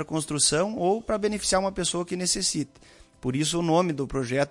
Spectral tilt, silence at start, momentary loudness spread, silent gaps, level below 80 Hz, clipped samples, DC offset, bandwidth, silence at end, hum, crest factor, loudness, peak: -3.5 dB/octave; 0 s; 8 LU; none; -50 dBFS; under 0.1%; under 0.1%; 11.5 kHz; 0 s; none; 16 dB; -25 LUFS; -10 dBFS